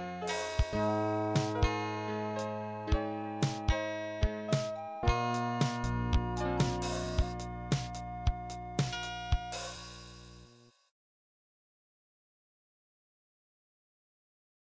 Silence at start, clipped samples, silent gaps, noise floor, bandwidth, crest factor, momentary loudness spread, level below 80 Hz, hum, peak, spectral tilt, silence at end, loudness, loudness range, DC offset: 0 s; under 0.1%; none; -60 dBFS; 8 kHz; 20 dB; 9 LU; -40 dBFS; none; -16 dBFS; -5.5 dB/octave; 4.25 s; -34 LUFS; 8 LU; under 0.1%